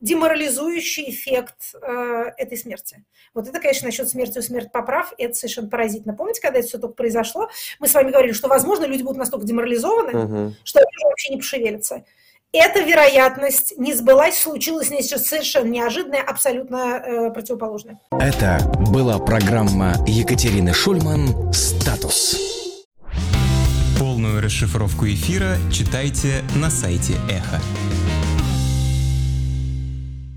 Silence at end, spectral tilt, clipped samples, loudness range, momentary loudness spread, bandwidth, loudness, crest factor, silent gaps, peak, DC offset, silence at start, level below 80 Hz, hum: 0 s; -4.5 dB/octave; under 0.1%; 8 LU; 12 LU; 17 kHz; -19 LUFS; 16 dB; 22.85-22.91 s; -4 dBFS; under 0.1%; 0 s; -30 dBFS; none